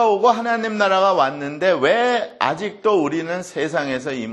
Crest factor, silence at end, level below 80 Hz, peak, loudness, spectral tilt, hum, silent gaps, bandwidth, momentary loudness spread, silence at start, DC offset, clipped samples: 18 dB; 0 s; -64 dBFS; 0 dBFS; -19 LUFS; -4.5 dB/octave; none; none; 11.5 kHz; 8 LU; 0 s; under 0.1%; under 0.1%